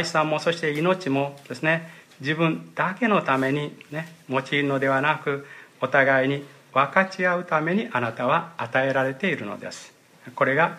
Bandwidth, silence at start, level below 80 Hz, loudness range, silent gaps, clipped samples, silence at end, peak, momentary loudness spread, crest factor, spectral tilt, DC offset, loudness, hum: 15 kHz; 0 s; -74 dBFS; 2 LU; none; under 0.1%; 0 s; -4 dBFS; 12 LU; 20 dB; -5.5 dB/octave; under 0.1%; -24 LUFS; none